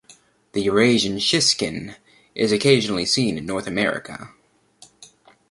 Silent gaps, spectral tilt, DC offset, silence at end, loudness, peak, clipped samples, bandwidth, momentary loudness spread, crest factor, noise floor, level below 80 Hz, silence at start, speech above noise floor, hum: none; -3.5 dB/octave; under 0.1%; 0.45 s; -20 LUFS; -2 dBFS; under 0.1%; 11.5 kHz; 17 LU; 20 dB; -53 dBFS; -54 dBFS; 0.55 s; 33 dB; none